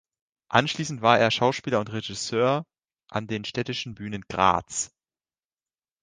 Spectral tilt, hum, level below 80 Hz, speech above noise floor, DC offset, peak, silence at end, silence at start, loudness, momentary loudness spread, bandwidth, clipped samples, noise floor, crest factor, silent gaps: -4 dB/octave; none; -58 dBFS; over 65 dB; under 0.1%; -4 dBFS; 1.15 s; 0.5 s; -25 LUFS; 13 LU; 10 kHz; under 0.1%; under -90 dBFS; 24 dB; none